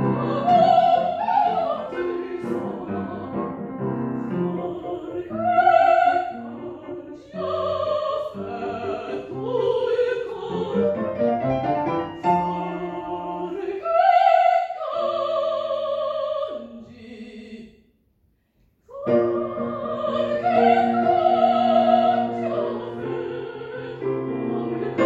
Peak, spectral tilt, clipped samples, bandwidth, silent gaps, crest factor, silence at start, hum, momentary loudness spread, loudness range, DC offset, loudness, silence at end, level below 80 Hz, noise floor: -4 dBFS; -7.5 dB/octave; under 0.1%; 7.8 kHz; none; 18 dB; 0 s; none; 15 LU; 8 LU; under 0.1%; -22 LUFS; 0 s; -60 dBFS; -65 dBFS